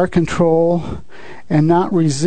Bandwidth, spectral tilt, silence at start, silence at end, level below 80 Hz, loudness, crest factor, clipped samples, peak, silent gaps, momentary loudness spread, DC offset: 9.4 kHz; -7 dB/octave; 0 s; 0 s; -40 dBFS; -15 LUFS; 14 dB; under 0.1%; -2 dBFS; none; 11 LU; 3%